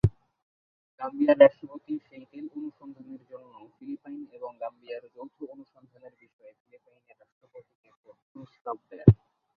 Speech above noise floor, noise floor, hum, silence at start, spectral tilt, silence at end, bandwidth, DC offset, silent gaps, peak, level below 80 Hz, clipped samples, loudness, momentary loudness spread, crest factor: over 61 dB; under -90 dBFS; none; 0.05 s; -8 dB/octave; 0.4 s; 4.9 kHz; under 0.1%; 0.42-0.98 s, 6.33-6.39 s, 6.60-6.65 s, 7.32-7.41 s, 7.75-7.83 s, 7.97-8.04 s, 8.22-8.35 s, 8.61-8.65 s; -2 dBFS; -50 dBFS; under 0.1%; -25 LUFS; 27 LU; 28 dB